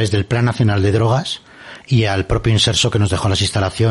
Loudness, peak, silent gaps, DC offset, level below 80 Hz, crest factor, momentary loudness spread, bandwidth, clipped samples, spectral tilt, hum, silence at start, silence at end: -16 LUFS; -2 dBFS; none; under 0.1%; -34 dBFS; 14 dB; 9 LU; 11.5 kHz; under 0.1%; -5 dB/octave; none; 0 s; 0 s